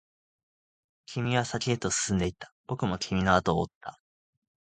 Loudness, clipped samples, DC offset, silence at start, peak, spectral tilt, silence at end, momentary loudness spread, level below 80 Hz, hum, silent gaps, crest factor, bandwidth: -29 LUFS; under 0.1%; under 0.1%; 1.1 s; -8 dBFS; -4.5 dB/octave; 0.75 s; 14 LU; -50 dBFS; none; 2.52-2.64 s, 3.75-3.81 s; 24 dB; 9.4 kHz